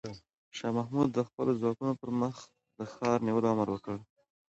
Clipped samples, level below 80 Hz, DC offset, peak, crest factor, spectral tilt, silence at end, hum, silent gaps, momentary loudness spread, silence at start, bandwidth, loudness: under 0.1%; -68 dBFS; under 0.1%; -14 dBFS; 18 dB; -7 dB/octave; 0.45 s; none; 0.38-0.51 s, 1.34-1.38 s; 16 LU; 0.05 s; 8.2 kHz; -32 LUFS